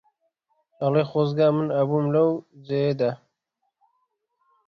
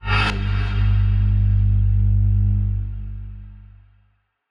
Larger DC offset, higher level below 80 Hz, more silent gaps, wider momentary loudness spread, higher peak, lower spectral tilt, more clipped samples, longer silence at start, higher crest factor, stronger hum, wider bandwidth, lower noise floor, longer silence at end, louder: neither; second, -66 dBFS vs -22 dBFS; neither; second, 8 LU vs 15 LU; about the same, -8 dBFS vs -8 dBFS; first, -9.5 dB/octave vs -7 dB/octave; neither; first, 0.8 s vs 0.05 s; about the same, 16 dB vs 12 dB; second, none vs 50 Hz at -20 dBFS; first, 6.2 kHz vs 5.6 kHz; first, -78 dBFS vs -63 dBFS; first, 1.5 s vs 0.9 s; second, -23 LUFS vs -20 LUFS